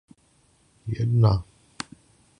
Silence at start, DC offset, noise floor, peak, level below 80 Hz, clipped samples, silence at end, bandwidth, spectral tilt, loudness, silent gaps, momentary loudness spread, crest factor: 0.85 s; under 0.1%; -62 dBFS; -6 dBFS; -44 dBFS; under 0.1%; 0.95 s; 10 kHz; -7.5 dB/octave; -23 LUFS; none; 18 LU; 20 dB